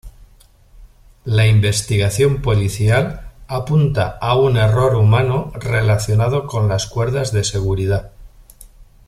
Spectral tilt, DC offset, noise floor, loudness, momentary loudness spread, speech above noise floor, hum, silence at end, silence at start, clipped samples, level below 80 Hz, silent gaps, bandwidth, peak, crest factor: -5.5 dB/octave; under 0.1%; -48 dBFS; -17 LUFS; 7 LU; 33 dB; none; 0.25 s; 0.05 s; under 0.1%; -36 dBFS; none; 13.5 kHz; -2 dBFS; 14 dB